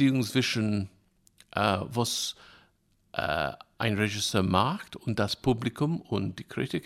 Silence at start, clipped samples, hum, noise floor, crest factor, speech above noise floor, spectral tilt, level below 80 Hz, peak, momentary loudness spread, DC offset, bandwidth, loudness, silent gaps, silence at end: 0 s; under 0.1%; none; -67 dBFS; 20 dB; 39 dB; -5 dB/octave; -56 dBFS; -8 dBFS; 9 LU; under 0.1%; 16 kHz; -29 LUFS; none; 0.05 s